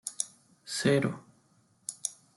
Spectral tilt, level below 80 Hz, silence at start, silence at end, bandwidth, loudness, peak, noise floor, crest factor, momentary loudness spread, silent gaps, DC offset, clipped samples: -4 dB/octave; -70 dBFS; 0.05 s; 0.25 s; 12.5 kHz; -32 LUFS; -10 dBFS; -67 dBFS; 24 dB; 17 LU; none; under 0.1%; under 0.1%